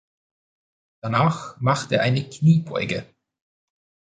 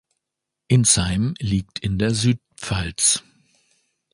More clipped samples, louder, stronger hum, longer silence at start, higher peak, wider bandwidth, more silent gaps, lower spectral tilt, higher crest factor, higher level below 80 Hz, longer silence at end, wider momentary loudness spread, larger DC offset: neither; about the same, -22 LUFS vs -20 LUFS; neither; first, 1.05 s vs 0.7 s; about the same, -4 dBFS vs -4 dBFS; second, 9.2 kHz vs 11.5 kHz; neither; first, -6.5 dB/octave vs -4 dB/octave; about the same, 20 dB vs 18 dB; second, -58 dBFS vs -40 dBFS; first, 1.1 s vs 0.95 s; about the same, 9 LU vs 10 LU; neither